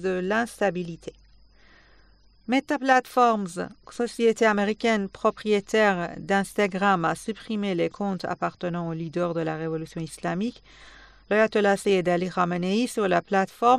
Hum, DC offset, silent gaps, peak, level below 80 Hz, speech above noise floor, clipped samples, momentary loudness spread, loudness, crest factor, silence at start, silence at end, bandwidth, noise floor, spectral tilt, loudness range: none; under 0.1%; none; -6 dBFS; -58 dBFS; 33 dB; under 0.1%; 11 LU; -25 LUFS; 18 dB; 0 s; 0 s; 14 kHz; -57 dBFS; -5.5 dB/octave; 5 LU